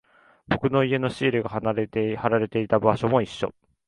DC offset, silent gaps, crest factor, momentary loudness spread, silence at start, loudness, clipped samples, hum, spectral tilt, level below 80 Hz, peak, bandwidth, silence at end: under 0.1%; none; 22 dB; 7 LU; 0.5 s; -24 LUFS; under 0.1%; none; -7.5 dB/octave; -54 dBFS; -4 dBFS; 11 kHz; 0.35 s